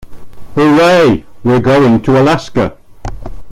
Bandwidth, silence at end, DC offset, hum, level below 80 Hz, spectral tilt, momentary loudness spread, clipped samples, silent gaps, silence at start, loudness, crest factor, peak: 15 kHz; 0 s; under 0.1%; none; -32 dBFS; -6.5 dB/octave; 20 LU; under 0.1%; none; 0 s; -10 LUFS; 10 dB; 0 dBFS